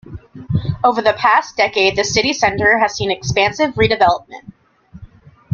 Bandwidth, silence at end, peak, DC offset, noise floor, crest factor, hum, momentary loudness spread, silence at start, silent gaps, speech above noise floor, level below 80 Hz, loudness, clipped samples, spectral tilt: 7.6 kHz; 0.5 s; 0 dBFS; under 0.1%; -43 dBFS; 16 dB; none; 8 LU; 0.05 s; none; 28 dB; -42 dBFS; -15 LUFS; under 0.1%; -4 dB/octave